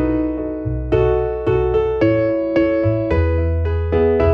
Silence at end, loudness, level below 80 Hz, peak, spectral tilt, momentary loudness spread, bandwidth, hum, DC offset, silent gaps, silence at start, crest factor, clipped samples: 0 s; -18 LUFS; -26 dBFS; -2 dBFS; -10 dB/octave; 4 LU; 5.4 kHz; none; under 0.1%; none; 0 s; 14 dB; under 0.1%